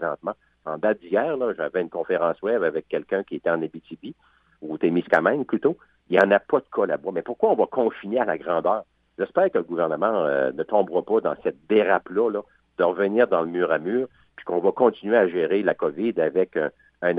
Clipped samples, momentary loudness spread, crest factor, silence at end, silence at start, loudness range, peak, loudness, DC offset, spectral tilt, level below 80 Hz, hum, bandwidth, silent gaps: under 0.1%; 11 LU; 18 dB; 0 s; 0 s; 3 LU; -4 dBFS; -23 LUFS; under 0.1%; -8 dB/octave; -68 dBFS; none; 4.9 kHz; none